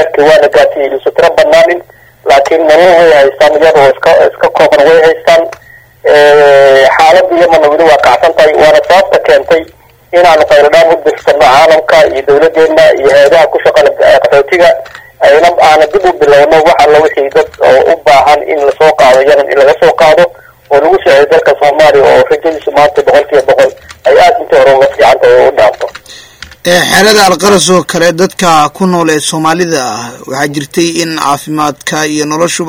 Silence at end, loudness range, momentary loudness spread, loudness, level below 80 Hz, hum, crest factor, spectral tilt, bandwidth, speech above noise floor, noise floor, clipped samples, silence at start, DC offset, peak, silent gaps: 0 s; 2 LU; 7 LU; -5 LUFS; -40 dBFS; none; 6 dB; -3.5 dB/octave; 17 kHz; 31 dB; -36 dBFS; 8%; 0 s; under 0.1%; 0 dBFS; none